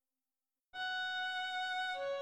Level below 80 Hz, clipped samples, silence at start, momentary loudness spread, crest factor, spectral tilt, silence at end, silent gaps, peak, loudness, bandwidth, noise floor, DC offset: -82 dBFS; under 0.1%; 0.75 s; 4 LU; 10 dB; 0.5 dB/octave; 0 s; none; -30 dBFS; -38 LUFS; 12.5 kHz; under -90 dBFS; under 0.1%